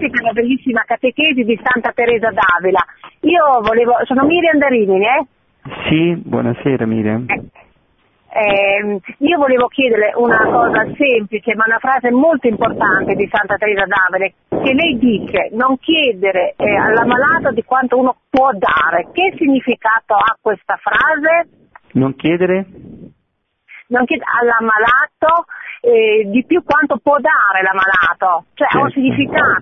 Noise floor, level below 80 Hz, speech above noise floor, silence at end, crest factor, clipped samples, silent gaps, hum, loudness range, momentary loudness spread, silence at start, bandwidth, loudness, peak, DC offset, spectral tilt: -67 dBFS; -48 dBFS; 54 dB; 0 s; 14 dB; under 0.1%; none; none; 4 LU; 6 LU; 0 s; 6 kHz; -14 LUFS; 0 dBFS; under 0.1%; -8 dB/octave